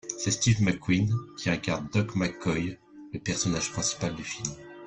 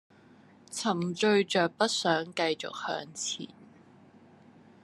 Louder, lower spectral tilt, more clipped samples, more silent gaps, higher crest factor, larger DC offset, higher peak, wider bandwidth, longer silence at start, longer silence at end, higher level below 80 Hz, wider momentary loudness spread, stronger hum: about the same, -28 LUFS vs -29 LUFS; about the same, -4.5 dB/octave vs -3.5 dB/octave; neither; neither; about the same, 18 dB vs 22 dB; neither; about the same, -10 dBFS vs -10 dBFS; second, 9.8 kHz vs 12.5 kHz; second, 0.05 s vs 0.7 s; second, 0 s vs 1.2 s; first, -54 dBFS vs -80 dBFS; about the same, 11 LU vs 10 LU; neither